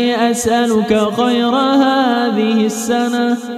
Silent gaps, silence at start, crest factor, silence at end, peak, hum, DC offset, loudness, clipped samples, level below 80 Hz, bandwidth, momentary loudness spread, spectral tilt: none; 0 s; 14 dB; 0 s; 0 dBFS; none; under 0.1%; -14 LUFS; under 0.1%; -52 dBFS; 14 kHz; 4 LU; -4 dB/octave